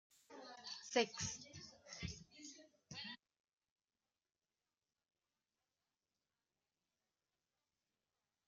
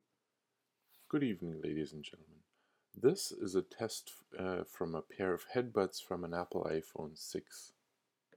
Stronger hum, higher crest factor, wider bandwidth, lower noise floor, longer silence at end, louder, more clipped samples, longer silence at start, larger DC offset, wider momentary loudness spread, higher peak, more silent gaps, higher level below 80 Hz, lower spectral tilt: neither; first, 28 dB vs 22 dB; second, 11 kHz vs 18 kHz; first, under -90 dBFS vs -86 dBFS; first, 5.3 s vs 0.65 s; second, -46 LUFS vs -39 LUFS; neither; second, 0.3 s vs 1.1 s; neither; first, 19 LU vs 13 LU; second, -24 dBFS vs -18 dBFS; neither; about the same, -74 dBFS vs -72 dBFS; second, -2.5 dB/octave vs -5 dB/octave